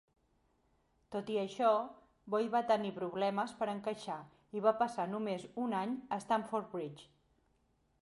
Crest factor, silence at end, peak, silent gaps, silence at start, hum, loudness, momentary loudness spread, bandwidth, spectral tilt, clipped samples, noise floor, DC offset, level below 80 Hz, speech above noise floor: 22 dB; 1 s; -16 dBFS; none; 1.1 s; none; -36 LUFS; 12 LU; 11.5 kHz; -6 dB/octave; under 0.1%; -75 dBFS; under 0.1%; -78 dBFS; 40 dB